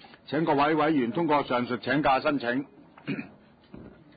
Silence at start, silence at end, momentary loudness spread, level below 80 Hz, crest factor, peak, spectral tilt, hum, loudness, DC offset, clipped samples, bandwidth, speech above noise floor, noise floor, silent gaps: 0.3 s; 0.25 s; 13 LU; -60 dBFS; 16 dB; -12 dBFS; -10 dB/octave; none; -26 LUFS; under 0.1%; under 0.1%; 5 kHz; 24 dB; -49 dBFS; none